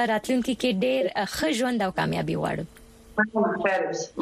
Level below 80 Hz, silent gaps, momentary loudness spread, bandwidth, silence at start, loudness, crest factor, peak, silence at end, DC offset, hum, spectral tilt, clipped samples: -54 dBFS; none; 6 LU; 15 kHz; 0 s; -26 LUFS; 16 dB; -10 dBFS; 0 s; under 0.1%; none; -5 dB/octave; under 0.1%